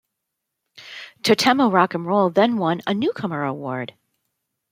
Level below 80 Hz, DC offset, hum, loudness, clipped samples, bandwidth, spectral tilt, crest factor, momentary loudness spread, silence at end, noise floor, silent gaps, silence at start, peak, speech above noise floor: -68 dBFS; under 0.1%; none; -20 LUFS; under 0.1%; 16.5 kHz; -5 dB/octave; 20 dB; 18 LU; 0.85 s; -80 dBFS; none; 0.75 s; -2 dBFS; 61 dB